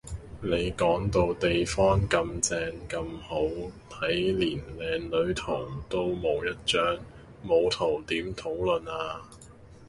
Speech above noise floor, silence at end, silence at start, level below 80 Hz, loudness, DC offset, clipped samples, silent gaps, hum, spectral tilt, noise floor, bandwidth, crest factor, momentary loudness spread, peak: 22 dB; 0 s; 0.05 s; -44 dBFS; -28 LUFS; under 0.1%; under 0.1%; none; none; -4.5 dB/octave; -50 dBFS; 11.5 kHz; 18 dB; 10 LU; -10 dBFS